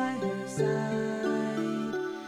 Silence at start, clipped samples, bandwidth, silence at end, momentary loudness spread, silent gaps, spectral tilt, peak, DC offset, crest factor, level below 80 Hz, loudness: 0 s; under 0.1%; 14.5 kHz; 0 s; 4 LU; none; -6 dB/octave; -18 dBFS; under 0.1%; 14 dB; -68 dBFS; -31 LUFS